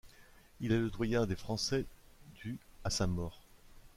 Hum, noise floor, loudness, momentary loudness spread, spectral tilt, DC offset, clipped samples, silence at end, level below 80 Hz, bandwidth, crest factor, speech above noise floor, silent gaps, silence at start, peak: none; -60 dBFS; -36 LUFS; 12 LU; -5 dB/octave; under 0.1%; under 0.1%; 0.1 s; -50 dBFS; 16 kHz; 18 dB; 26 dB; none; 0.05 s; -18 dBFS